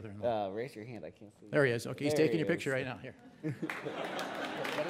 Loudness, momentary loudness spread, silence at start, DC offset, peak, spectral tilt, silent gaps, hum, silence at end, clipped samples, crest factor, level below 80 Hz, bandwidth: -34 LUFS; 16 LU; 0 s; under 0.1%; -16 dBFS; -5.5 dB/octave; none; none; 0 s; under 0.1%; 20 dB; -74 dBFS; 16 kHz